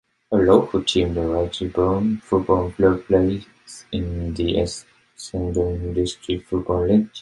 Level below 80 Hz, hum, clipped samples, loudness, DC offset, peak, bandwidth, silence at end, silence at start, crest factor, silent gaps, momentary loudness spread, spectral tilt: -36 dBFS; none; under 0.1%; -21 LUFS; under 0.1%; -2 dBFS; 11.5 kHz; 0 s; 0.3 s; 18 dB; none; 12 LU; -6.5 dB/octave